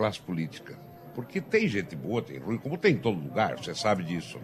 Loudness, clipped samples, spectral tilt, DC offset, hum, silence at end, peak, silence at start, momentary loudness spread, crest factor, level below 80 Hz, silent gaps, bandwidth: -29 LUFS; under 0.1%; -6 dB/octave; under 0.1%; none; 0 s; -10 dBFS; 0 s; 15 LU; 20 dB; -62 dBFS; none; 14 kHz